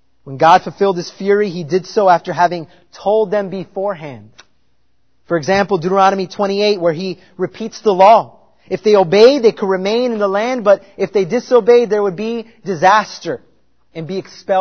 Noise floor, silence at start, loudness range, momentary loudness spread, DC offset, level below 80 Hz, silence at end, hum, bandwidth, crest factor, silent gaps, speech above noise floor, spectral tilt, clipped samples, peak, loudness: -65 dBFS; 0.25 s; 5 LU; 15 LU; 0.3%; -58 dBFS; 0 s; none; 6.6 kHz; 14 dB; none; 51 dB; -5.5 dB/octave; 0.1%; 0 dBFS; -14 LUFS